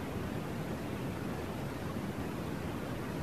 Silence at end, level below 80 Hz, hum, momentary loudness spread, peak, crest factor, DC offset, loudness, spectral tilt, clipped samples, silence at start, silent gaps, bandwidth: 0 s; -52 dBFS; none; 1 LU; -26 dBFS; 12 dB; 0.2%; -39 LUFS; -6.5 dB/octave; under 0.1%; 0 s; none; 14 kHz